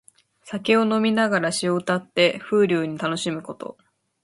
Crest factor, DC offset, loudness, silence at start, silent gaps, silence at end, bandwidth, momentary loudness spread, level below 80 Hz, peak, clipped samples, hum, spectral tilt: 18 dB; under 0.1%; -22 LUFS; 0.45 s; none; 0.5 s; 11.5 kHz; 14 LU; -68 dBFS; -4 dBFS; under 0.1%; none; -4.5 dB/octave